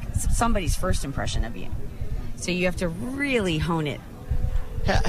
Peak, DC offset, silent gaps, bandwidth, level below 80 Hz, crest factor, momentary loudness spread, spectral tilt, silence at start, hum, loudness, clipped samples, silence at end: -12 dBFS; under 0.1%; none; 14.5 kHz; -28 dBFS; 12 dB; 11 LU; -5 dB/octave; 0 s; none; -27 LUFS; under 0.1%; 0 s